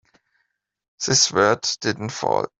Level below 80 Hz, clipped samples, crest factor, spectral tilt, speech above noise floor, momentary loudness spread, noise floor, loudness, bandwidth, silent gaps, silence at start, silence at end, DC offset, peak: -60 dBFS; under 0.1%; 20 dB; -2.5 dB/octave; 53 dB; 10 LU; -74 dBFS; -20 LUFS; 8.2 kHz; none; 1 s; 0.1 s; under 0.1%; -2 dBFS